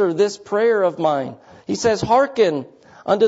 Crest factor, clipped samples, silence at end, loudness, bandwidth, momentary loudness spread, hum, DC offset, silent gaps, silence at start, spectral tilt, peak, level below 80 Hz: 14 dB; under 0.1%; 0 s; -19 LUFS; 8 kHz; 13 LU; none; under 0.1%; none; 0 s; -5 dB/octave; -4 dBFS; -54 dBFS